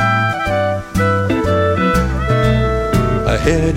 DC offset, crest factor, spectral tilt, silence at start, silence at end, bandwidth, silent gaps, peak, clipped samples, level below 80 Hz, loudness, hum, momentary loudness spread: under 0.1%; 14 dB; -6.5 dB/octave; 0 s; 0 s; 16.5 kHz; none; 0 dBFS; under 0.1%; -24 dBFS; -15 LUFS; none; 3 LU